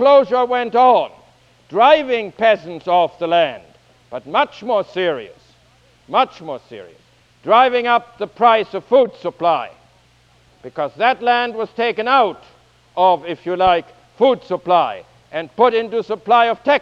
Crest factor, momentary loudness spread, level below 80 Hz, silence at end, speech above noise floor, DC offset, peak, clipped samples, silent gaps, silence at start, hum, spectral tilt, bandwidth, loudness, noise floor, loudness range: 18 dB; 16 LU; -58 dBFS; 0 s; 37 dB; under 0.1%; 0 dBFS; under 0.1%; none; 0 s; none; -5.5 dB/octave; 7 kHz; -16 LUFS; -53 dBFS; 5 LU